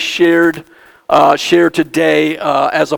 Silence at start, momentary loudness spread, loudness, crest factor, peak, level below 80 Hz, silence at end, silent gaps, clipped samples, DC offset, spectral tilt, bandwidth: 0 s; 4 LU; -12 LUFS; 12 dB; 0 dBFS; -54 dBFS; 0 s; none; 0.1%; under 0.1%; -4.5 dB/octave; 18.5 kHz